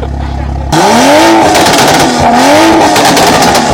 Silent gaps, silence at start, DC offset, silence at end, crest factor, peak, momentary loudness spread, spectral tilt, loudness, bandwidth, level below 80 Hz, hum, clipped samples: none; 0 s; under 0.1%; 0 s; 6 dB; 0 dBFS; 10 LU; -3.5 dB/octave; -5 LUFS; over 20 kHz; -22 dBFS; none; 4%